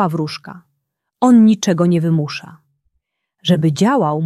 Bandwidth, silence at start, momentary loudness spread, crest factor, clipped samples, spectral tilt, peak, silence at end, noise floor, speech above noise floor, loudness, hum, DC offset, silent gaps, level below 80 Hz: 12.5 kHz; 0 s; 15 LU; 14 dB; under 0.1%; -6.5 dB/octave; -2 dBFS; 0 s; -73 dBFS; 59 dB; -15 LUFS; none; under 0.1%; none; -60 dBFS